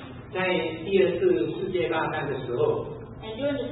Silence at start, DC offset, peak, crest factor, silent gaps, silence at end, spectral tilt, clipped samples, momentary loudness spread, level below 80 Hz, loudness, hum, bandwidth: 0 s; under 0.1%; -10 dBFS; 18 dB; none; 0 s; -10.5 dB/octave; under 0.1%; 11 LU; -52 dBFS; -26 LUFS; none; 4.1 kHz